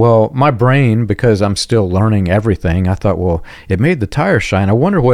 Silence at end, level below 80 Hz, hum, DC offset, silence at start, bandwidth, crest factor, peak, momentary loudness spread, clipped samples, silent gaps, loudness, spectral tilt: 0 s; -34 dBFS; none; under 0.1%; 0 s; 11 kHz; 10 dB; -2 dBFS; 4 LU; under 0.1%; none; -13 LUFS; -7 dB/octave